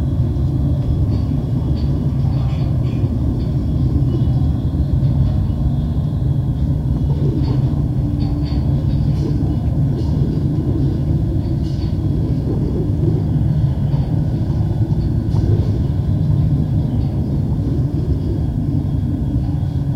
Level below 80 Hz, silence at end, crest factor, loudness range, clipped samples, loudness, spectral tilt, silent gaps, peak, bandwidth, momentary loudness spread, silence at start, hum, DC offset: -24 dBFS; 0 s; 12 dB; 1 LU; under 0.1%; -18 LUFS; -10 dB/octave; none; -4 dBFS; 6.2 kHz; 3 LU; 0 s; none; under 0.1%